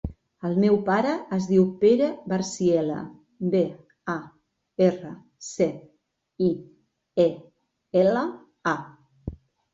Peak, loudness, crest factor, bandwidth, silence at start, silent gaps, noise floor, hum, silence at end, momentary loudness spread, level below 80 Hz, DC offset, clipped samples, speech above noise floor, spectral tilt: -8 dBFS; -24 LUFS; 18 dB; 8 kHz; 0.05 s; none; -70 dBFS; none; 0.4 s; 19 LU; -52 dBFS; under 0.1%; under 0.1%; 47 dB; -6.5 dB/octave